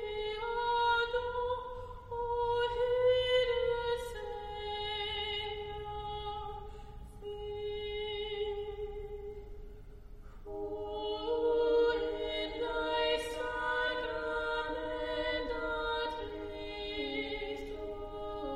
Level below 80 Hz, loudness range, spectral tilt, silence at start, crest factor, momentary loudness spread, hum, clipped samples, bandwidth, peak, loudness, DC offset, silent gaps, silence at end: -50 dBFS; 8 LU; -4.5 dB/octave; 0 s; 16 dB; 15 LU; none; under 0.1%; 12 kHz; -20 dBFS; -35 LUFS; under 0.1%; none; 0 s